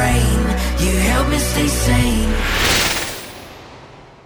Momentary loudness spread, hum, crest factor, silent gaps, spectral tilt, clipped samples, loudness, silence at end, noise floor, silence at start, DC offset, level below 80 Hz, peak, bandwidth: 17 LU; none; 14 dB; none; -4 dB/octave; under 0.1%; -17 LUFS; 0.25 s; -40 dBFS; 0 s; under 0.1%; -22 dBFS; -4 dBFS; over 20 kHz